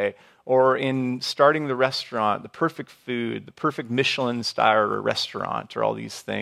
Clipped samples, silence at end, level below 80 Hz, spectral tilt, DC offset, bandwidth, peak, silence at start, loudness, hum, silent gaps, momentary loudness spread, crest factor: under 0.1%; 0 s; -70 dBFS; -5 dB/octave; under 0.1%; 14 kHz; -4 dBFS; 0 s; -24 LUFS; none; none; 10 LU; 20 dB